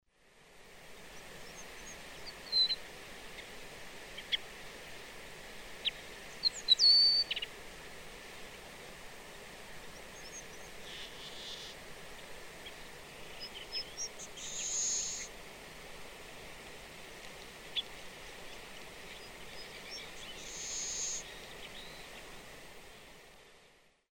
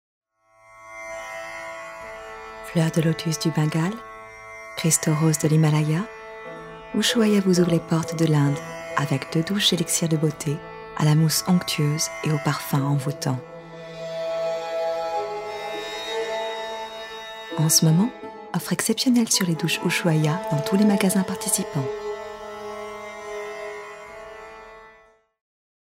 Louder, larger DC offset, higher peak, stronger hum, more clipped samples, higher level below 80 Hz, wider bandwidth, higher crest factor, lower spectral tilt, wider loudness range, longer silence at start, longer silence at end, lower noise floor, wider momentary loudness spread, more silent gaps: second, -33 LUFS vs -23 LUFS; neither; second, -14 dBFS vs -4 dBFS; neither; neither; about the same, -60 dBFS vs -60 dBFS; about the same, 16.5 kHz vs 16 kHz; first, 26 dB vs 20 dB; second, 0.5 dB/octave vs -4.5 dB/octave; first, 17 LU vs 7 LU; second, 0.25 s vs 0.7 s; second, 0.4 s vs 1 s; first, -65 dBFS vs -56 dBFS; about the same, 18 LU vs 18 LU; neither